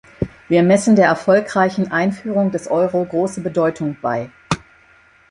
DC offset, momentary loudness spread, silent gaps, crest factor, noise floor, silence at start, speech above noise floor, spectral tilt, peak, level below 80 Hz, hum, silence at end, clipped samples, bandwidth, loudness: under 0.1%; 12 LU; none; 16 dB; -51 dBFS; 0.2 s; 35 dB; -6.5 dB/octave; -2 dBFS; -48 dBFS; none; 0.7 s; under 0.1%; 11.5 kHz; -18 LUFS